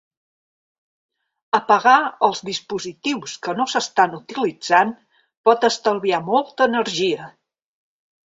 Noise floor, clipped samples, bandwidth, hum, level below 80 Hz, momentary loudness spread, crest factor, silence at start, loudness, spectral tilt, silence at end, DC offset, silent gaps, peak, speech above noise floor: under -90 dBFS; under 0.1%; 8 kHz; none; -68 dBFS; 11 LU; 20 dB; 1.55 s; -19 LUFS; -3.5 dB/octave; 1 s; under 0.1%; 5.37-5.44 s; 0 dBFS; over 71 dB